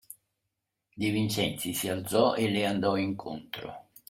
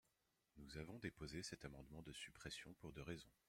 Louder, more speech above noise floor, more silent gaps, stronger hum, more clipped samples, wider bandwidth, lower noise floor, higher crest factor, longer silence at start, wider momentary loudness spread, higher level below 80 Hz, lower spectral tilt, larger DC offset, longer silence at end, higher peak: first, -29 LUFS vs -55 LUFS; first, 55 dB vs 31 dB; neither; neither; neither; about the same, 16.5 kHz vs 16 kHz; about the same, -84 dBFS vs -86 dBFS; about the same, 20 dB vs 22 dB; second, 0.1 s vs 0.55 s; first, 14 LU vs 6 LU; first, -64 dBFS vs -70 dBFS; about the same, -4.5 dB/octave vs -4 dB/octave; neither; first, 0.3 s vs 0.15 s; first, -12 dBFS vs -34 dBFS